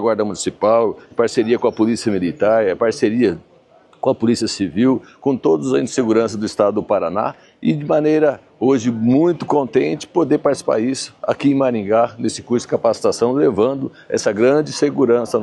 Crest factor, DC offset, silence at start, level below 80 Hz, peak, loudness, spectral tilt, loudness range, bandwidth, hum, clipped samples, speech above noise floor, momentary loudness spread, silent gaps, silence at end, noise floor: 16 dB; under 0.1%; 0 s; -58 dBFS; 0 dBFS; -17 LUFS; -5.5 dB/octave; 1 LU; 12 kHz; none; under 0.1%; 33 dB; 6 LU; none; 0 s; -50 dBFS